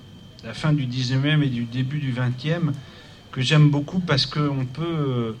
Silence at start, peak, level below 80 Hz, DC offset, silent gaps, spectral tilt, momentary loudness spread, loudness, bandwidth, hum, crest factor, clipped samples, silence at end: 0 s; -6 dBFS; -52 dBFS; under 0.1%; none; -6.5 dB/octave; 11 LU; -22 LUFS; 9 kHz; none; 16 dB; under 0.1%; 0 s